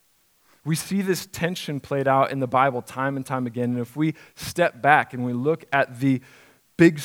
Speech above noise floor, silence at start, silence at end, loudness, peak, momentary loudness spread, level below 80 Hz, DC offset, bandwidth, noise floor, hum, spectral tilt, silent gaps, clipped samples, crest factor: 40 dB; 0.65 s; 0 s; -23 LUFS; 0 dBFS; 9 LU; -62 dBFS; under 0.1%; 17.5 kHz; -63 dBFS; none; -6 dB/octave; none; under 0.1%; 22 dB